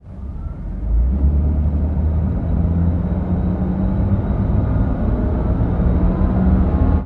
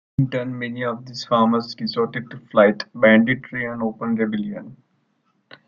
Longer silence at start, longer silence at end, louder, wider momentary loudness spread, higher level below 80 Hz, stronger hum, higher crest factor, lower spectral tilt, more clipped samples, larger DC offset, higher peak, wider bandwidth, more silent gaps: second, 0.05 s vs 0.2 s; second, 0 s vs 0.95 s; about the same, -19 LUFS vs -21 LUFS; second, 5 LU vs 12 LU; first, -20 dBFS vs -58 dBFS; neither; second, 14 dB vs 20 dB; first, -12 dB/octave vs -7 dB/octave; neither; neither; about the same, -4 dBFS vs -2 dBFS; second, 3.9 kHz vs 7.2 kHz; neither